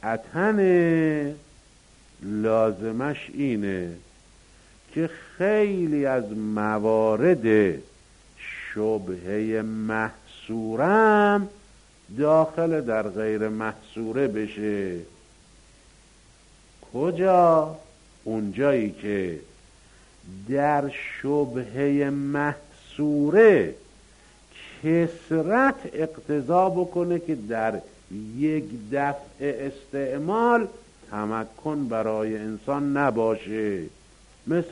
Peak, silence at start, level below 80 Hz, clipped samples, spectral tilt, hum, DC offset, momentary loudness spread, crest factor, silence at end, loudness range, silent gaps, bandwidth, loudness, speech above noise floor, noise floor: -6 dBFS; 0.05 s; -56 dBFS; under 0.1%; -7.5 dB/octave; none; under 0.1%; 15 LU; 20 dB; 0 s; 6 LU; none; 10.5 kHz; -24 LUFS; 31 dB; -54 dBFS